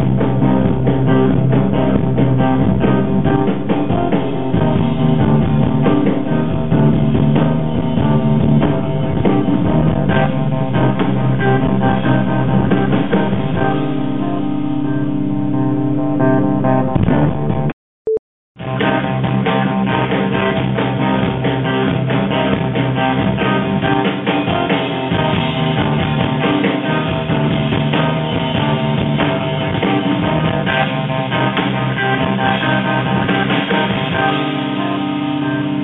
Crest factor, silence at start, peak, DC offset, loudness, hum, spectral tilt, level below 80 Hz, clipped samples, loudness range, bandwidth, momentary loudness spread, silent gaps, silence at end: 12 dB; 0 s; -2 dBFS; under 0.1%; -16 LUFS; none; -10.5 dB/octave; -36 dBFS; under 0.1%; 2 LU; 4 kHz; 4 LU; 17.73-18.05 s, 18.19-18.55 s; 0 s